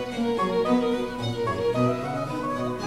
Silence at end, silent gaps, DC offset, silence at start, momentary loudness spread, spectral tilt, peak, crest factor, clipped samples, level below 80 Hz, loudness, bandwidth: 0 s; none; under 0.1%; 0 s; 6 LU; -6.5 dB/octave; -10 dBFS; 14 dB; under 0.1%; -50 dBFS; -26 LUFS; 14 kHz